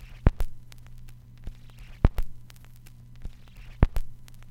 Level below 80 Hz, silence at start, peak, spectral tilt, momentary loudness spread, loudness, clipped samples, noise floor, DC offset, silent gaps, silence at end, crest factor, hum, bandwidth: -30 dBFS; 0 s; 0 dBFS; -8 dB/octave; 23 LU; -30 LUFS; under 0.1%; -47 dBFS; under 0.1%; none; 0.05 s; 28 dB; none; 16 kHz